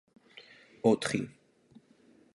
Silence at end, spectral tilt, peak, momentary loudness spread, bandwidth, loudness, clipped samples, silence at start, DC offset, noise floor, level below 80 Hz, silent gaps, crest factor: 1.05 s; -5 dB/octave; -10 dBFS; 25 LU; 11.5 kHz; -30 LUFS; under 0.1%; 0.35 s; under 0.1%; -63 dBFS; -72 dBFS; none; 24 dB